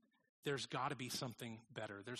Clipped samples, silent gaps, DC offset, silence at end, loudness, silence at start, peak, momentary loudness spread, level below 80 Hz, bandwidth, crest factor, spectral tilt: under 0.1%; none; under 0.1%; 0 s; -46 LUFS; 0.45 s; -28 dBFS; 8 LU; -82 dBFS; 13 kHz; 18 dB; -4 dB/octave